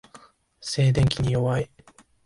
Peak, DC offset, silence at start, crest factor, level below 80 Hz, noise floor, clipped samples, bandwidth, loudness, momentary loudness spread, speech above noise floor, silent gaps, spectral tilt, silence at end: -8 dBFS; under 0.1%; 0.15 s; 18 dB; -44 dBFS; -55 dBFS; under 0.1%; 11.5 kHz; -23 LUFS; 14 LU; 33 dB; none; -6 dB/octave; 0.6 s